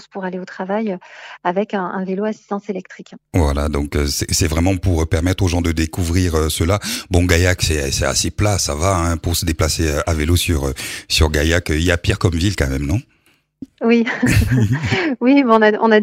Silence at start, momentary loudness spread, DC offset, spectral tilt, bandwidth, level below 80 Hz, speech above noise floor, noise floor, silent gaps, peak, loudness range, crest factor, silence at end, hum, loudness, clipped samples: 0.15 s; 10 LU; under 0.1%; -5 dB/octave; 16.5 kHz; -28 dBFS; 42 dB; -59 dBFS; none; 0 dBFS; 4 LU; 18 dB; 0 s; none; -17 LUFS; under 0.1%